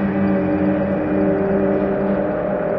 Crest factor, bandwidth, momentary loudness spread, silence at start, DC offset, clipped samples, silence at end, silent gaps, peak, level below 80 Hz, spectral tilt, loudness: 12 dB; 5 kHz; 2 LU; 0 s; under 0.1%; under 0.1%; 0 s; none; -8 dBFS; -42 dBFS; -11.5 dB/octave; -19 LUFS